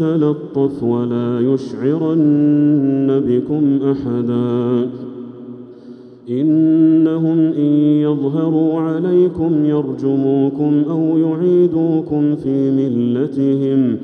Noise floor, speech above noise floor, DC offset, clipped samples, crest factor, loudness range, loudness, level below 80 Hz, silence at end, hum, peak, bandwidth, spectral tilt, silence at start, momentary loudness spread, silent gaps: -37 dBFS; 22 dB; under 0.1%; under 0.1%; 12 dB; 3 LU; -15 LUFS; -56 dBFS; 0 s; none; -4 dBFS; 4.9 kHz; -10.5 dB/octave; 0 s; 6 LU; none